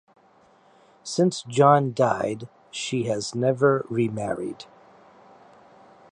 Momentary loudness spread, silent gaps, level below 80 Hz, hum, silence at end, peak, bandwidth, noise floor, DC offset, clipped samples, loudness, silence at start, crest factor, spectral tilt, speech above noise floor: 18 LU; none; -66 dBFS; none; 1.5 s; -4 dBFS; 10.5 kHz; -57 dBFS; under 0.1%; under 0.1%; -23 LUFS; 1.05 s; 20 dB; -5.5 dB/octave; 35 dB